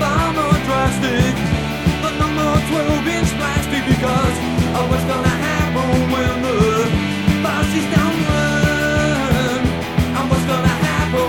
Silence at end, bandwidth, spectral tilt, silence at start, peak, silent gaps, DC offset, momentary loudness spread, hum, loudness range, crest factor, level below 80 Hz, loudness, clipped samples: 0 s; 18 kHz; -5.5 dB/octave; 0 s; 0 dBFS; none; 0.4%; 3 LU; none; 1 LU; 16 dB; -30 dBFS; -17 LUFS; under 0.1%